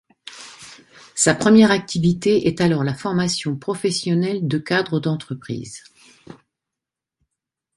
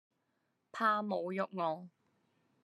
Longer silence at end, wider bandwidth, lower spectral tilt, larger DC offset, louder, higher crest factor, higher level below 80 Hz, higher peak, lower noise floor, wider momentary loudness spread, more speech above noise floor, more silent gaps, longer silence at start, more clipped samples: first, 1.45 s vs 0.75 s; about the same, 11.5 kHz vs 12.5 kHz; second, -5 dB/octave vs -6.5 dB/octave; neither; first, -19 LUFS vs -36 LUFS; about the same, 20 dB vs 20 dB; first, -54 dBFS vs under -90 dBFS; first, -2 dBFS vs -20 dBFS; first, -86 dBFS vs -81 dBFS; first, 23 LU vs 11 LU; first, 67 dB vs 46 dB; neither; second, 0.25 s vs 0.75 s; neither